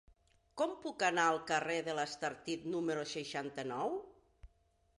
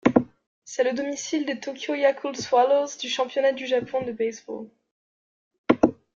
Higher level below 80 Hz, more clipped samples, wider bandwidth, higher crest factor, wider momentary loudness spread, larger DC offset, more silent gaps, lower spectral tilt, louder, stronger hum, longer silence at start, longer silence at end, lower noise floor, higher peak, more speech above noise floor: second, -70 dBFS vs -60 dBFS; neither; first, 11.5 kHz vs 7.6 kHz; about the same, 20 dB vs 22 dB; second, 9 LU vs 15 LU; neither; second, none vs 0.47-0.62 s, 4.91-5.51 s, 5.58-5.64 s; about the same, -3.5 dB/octave vs -4 dB/octave; second, -37 LUFS vs -25 LUFS; neither; first, 0.55 s vs 0.05 s; first, 0.55 s vs 0.25 s; second, -74 dBFS vs under -90 dBFS; second, -18 dBFS vs -2 dBFS; second, 37 dB vs over 65 dB